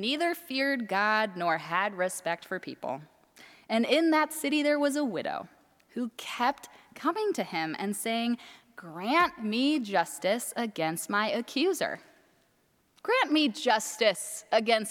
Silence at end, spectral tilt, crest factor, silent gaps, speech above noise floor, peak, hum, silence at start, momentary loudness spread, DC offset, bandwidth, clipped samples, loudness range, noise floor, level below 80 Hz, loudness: 0 s; -3 dB/octave; 20 dB; none; 40 dB; -10 dBFS; none; 0 s; 12 LU; under 0.1%; 18 kHz; under 0.1%; 4 LU; -69 dBFS; -76 dBFS; -29 LUFS